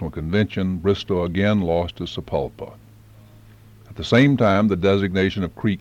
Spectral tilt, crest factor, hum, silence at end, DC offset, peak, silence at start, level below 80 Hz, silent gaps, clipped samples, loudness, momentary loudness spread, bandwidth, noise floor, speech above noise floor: -7.5 dB/octave; 16 dB; none; 0 s; under 0.1%; -6 dBFS; 0 s; -44 dBFS; none; under 0.1%; -20 LUFS; 13 LU; 8.8 kHz; -47 dBFS; 27 dB